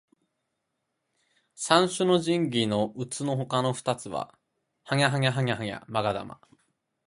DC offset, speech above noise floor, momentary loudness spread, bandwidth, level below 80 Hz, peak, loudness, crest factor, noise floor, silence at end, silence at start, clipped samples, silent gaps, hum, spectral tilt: under 0.1%; 54 dB; 12 LU; 11.5 kHz; -64 dBFS; -6 dBFS; -27 LUFS; 24 dB; -80 dBFS; 0.75 s; 1.6 s; under 0.1%; none; none; -5 dB/octave